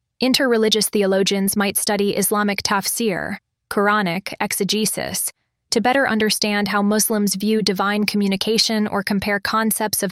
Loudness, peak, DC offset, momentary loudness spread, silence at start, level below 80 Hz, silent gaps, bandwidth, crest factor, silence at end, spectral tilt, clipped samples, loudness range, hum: -19 LUFS; -4 dBFS; under 0.1%; 6 LU; 0.2 s; -56 dBFS; none; 16.5 kHz; 16 dB; 0 s; -3.5 dB/octave; under 0.1%; 2 LU; none